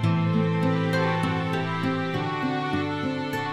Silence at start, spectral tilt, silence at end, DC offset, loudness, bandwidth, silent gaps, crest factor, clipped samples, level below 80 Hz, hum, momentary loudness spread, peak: 0 s; -7 dB/octave; 0 s; under 0.1%; -25 LUFS; 13 kHz; none; 14 dB; under 0.1%; -58 dBFS; none; 4 LU; -12 dBFS